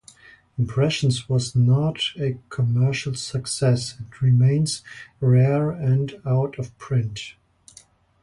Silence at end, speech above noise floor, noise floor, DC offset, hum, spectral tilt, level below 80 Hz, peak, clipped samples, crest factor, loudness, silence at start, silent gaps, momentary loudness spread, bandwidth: 0.9 s; 32 dB; -53 dBFS; under 0.1%; none; -6 dB/octave; -52 dBFS; -8 dBFS; under 0.1%; 14 dB; -22 LUFS; 0.6 s; none; 13 LU; 11.5 kHz